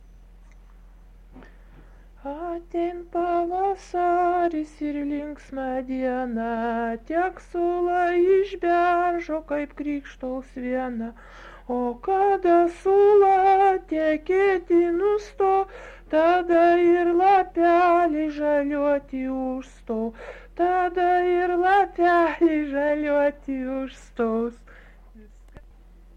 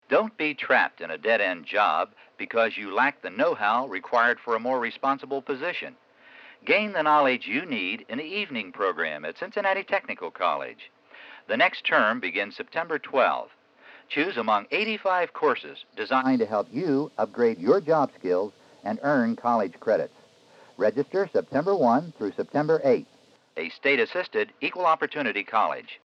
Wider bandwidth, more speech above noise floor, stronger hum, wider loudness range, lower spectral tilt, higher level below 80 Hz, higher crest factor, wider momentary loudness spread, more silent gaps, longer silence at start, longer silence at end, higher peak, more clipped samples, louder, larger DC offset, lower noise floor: about the same, 7.8 kHz vs 7.6 kHz; about the same, 27 dB vs 29 dB; neither; first, 8 LU vs 2 LU; about the same, -6 dB/octave vs -6 dB/octave; first, -48 dBFS vs -86 dBFS; about the same, 14 dB vs 18 dB; first, 14 LU vs 10 LU; neither; first, 1.35 s vs 0.1 s; first, 1.6 s vs 0.1 s; about the same, -10 dBFS vs -8 dBFS; neither; about the same, -23 LUFS vs -25 LUFS; neither; second, -49 dBFS vs -55 dBFS